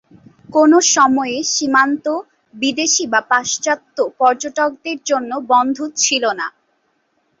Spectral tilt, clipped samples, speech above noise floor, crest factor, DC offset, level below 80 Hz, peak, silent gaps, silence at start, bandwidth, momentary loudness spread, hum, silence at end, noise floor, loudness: -1 dB/octave; under 0.1%; 48 dB; 16 dB; under 0.1%; -66 dBFS; -2 dBFS; none; 0.5 s; 8 kHz; 9 LU; none; 0.9 s; -64 dBFS; -16 LUFS